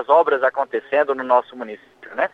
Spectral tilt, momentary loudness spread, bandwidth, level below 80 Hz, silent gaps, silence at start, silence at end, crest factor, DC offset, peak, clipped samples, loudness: -5.5 dB/octave; 18 LU; 5.4 kHz; -72 dBFS; none; 0 s; 0.05 s; 18 dB; under 0.1%; -2 dBFS; under 0.1%; -19 LUFS